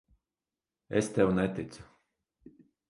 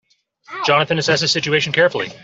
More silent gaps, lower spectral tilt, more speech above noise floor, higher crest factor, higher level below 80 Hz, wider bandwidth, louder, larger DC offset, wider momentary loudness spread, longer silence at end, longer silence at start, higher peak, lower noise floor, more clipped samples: neither; first, -6.5 dB/octave vs -3.5 dB/octave; first, over 61 dB vs 31 dB; first, 22 dB vs 16 dB; about the same, -58 dBFS vs -58 dBFS; first, 11.5 kHz vs 8 kHz; second, -30 LUFS vs -16 LUFS; neither; first, 17 LU vs 4 LU; first, 1.05 s vs 0.05 s; first, 0.9 s vs 0.5 s; second, -12 dBFS vs -2 dBFS; first, under -90 dBFS vs -48 dBFS; neither